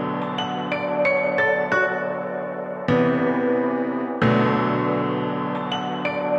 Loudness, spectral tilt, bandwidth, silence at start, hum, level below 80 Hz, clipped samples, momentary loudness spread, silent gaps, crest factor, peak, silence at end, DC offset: -22 LUFS; -7 dB/octave; 7.4 kHz; 0 s; none; -58 dBFS; under 0.1%; 7 LU; none; 16 dB; -8 dBFS; 0 s; under 0.1%